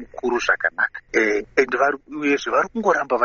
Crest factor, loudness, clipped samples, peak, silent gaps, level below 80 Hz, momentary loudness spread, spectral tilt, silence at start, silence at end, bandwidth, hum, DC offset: 18 dB; -21 LUFS; under 0.1%; -2 dBFS; none; -54 dBFS; 3 LU; -1.5 dB/octave; 0 s; 0 s; 7 kHz; none; under 0.1%